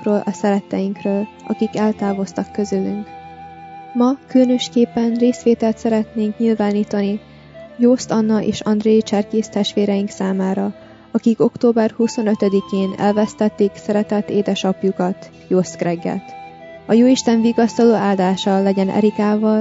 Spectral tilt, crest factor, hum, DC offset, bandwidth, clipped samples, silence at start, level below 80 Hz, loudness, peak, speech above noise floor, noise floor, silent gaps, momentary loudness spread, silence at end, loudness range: -6.5 dB/octave; 14 dB; none; under 0.1%; 7.8 kHz; under 0.1%; 0 s; -56 dBFS; -18 LUFS; -2 dBFS; 19 dB; -36 dBFS; none; 10 LU; 0 s; 4 LU